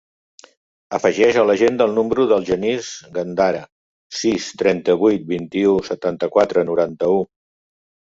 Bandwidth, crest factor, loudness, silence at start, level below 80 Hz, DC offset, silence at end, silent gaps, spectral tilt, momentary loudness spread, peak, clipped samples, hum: 7.8 kHz; 16 dB; -18 LUFS; 0.9 s; -56 dBFS; under 0.1%; 0.85 s; 3.72-4.10 s; -5 dB/octave; 10 LU; -2 dBFS; under 0.1%; none